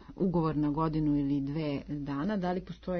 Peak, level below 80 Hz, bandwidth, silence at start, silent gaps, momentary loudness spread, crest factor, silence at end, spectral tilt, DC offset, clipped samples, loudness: -18 dBFS; -50 dBFS; 6.2 kHz; 0 s; none; 7 LU; 12 dB; 0 s; -9.5 dB/octave; under 0.1%; under 0.1%; -31 LUFS